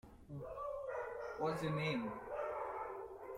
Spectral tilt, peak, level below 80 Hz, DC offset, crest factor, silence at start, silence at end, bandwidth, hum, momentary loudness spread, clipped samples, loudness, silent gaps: -6.5 dB/octave; -26 dBFS; -66 dBFS; under 0.1%; 16 dB; 0.05 s; 0 s; 15 kHz; none; 10 LU; under 0.1%; -43 LUFS; none